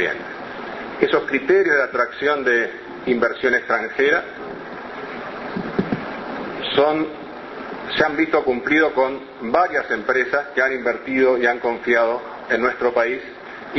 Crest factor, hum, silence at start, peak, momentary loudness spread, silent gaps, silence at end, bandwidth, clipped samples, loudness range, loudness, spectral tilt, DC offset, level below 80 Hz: 20 dB; none; 0 s; 0 dBFS; 14 LU; none; 0 s; 6.2 kHz; under 0.1%; 5 LU; -20 LUFS; -5.5 dB/octave; under 0.1%; -56 dBFS